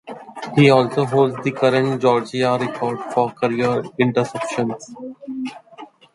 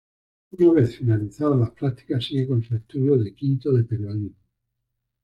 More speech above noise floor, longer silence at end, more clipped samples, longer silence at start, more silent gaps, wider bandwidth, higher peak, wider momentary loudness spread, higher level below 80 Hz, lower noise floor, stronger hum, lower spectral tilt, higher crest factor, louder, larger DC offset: second, 24 dB vs 57 dB; second, 0.3 s vs 0.9 s; neither; second, 0.05 s vs 0.55 s; neither; first, 11.5 kHz vs 7.6 kHz; first, -2 dBFS vs -6 dBFS; first, 17 LU vs 10 LU; second, -62 dBFS vs -56 dBFS; second, -42 dBFS vs -79 dBFS; neither; second, -6.5 dB/octave vs -9.5 dB/octave; about the same, 18 dB vs 16 dB; first, -19 LUFS vs -23 LUFS; neither